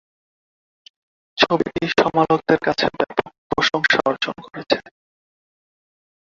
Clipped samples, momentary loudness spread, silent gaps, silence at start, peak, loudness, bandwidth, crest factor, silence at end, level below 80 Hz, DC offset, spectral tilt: under 0.1%; 9 LU; 3.38-3.50 s; 1.35 s; -2 dBFS; -19 LUFS; 7.6 kHz; 20 dB; 1.5 s; -54 dBFS; under 0.1%; -4.5 dB/octave